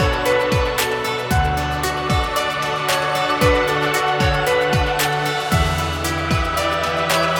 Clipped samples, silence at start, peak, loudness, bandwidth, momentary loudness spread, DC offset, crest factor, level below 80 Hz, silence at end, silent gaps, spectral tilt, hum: under 0.1%; 0 s; -4 dBFS; -18 LUFS; 19 kHz; 4 LU; under 0.1%; 14 dB; -30 dBFS; 0 s; none; -4 dB/octave; none